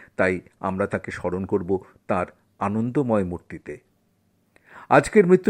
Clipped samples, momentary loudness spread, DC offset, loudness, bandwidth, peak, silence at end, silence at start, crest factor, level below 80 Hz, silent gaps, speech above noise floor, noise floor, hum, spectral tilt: under 0.1%; 18 LU; under 0.1%; -24 LUFS; 11 kHz; -2 dBFS; 0 s; 0.2 s; 22 dB; -54 dBFS; none; 44 dB; -66 dBFS; none; -7 dB/octave